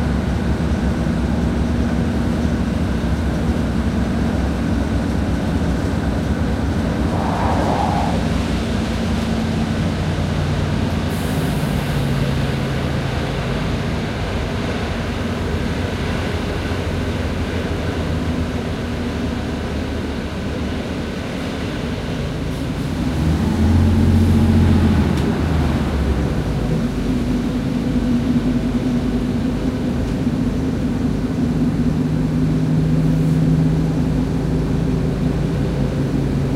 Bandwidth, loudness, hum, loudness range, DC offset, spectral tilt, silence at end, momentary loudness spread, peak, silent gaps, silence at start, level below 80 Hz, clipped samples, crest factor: 15.5 kHz; -20 LUFS; none; 6 LU; under 0.1%; -7 dB/octave; 0 s; 7 LU; -2 dBFS; none; 0 s; -26 dBFS; under 0.1%; 16 dB